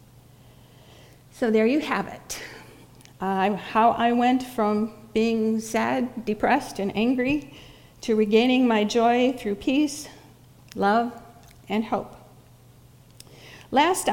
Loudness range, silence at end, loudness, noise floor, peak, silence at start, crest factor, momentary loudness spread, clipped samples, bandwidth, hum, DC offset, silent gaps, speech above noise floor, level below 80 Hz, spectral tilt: 6 LU; 0 s; -23 LUFS; -52 dBFS; -6 dBFS; 1.35 s; 18 dB; 15 LU; under 0.1%; 17 kHz; none; under 0.1%; none; 29 dB; -56 dBFS; -4.5 dB/octave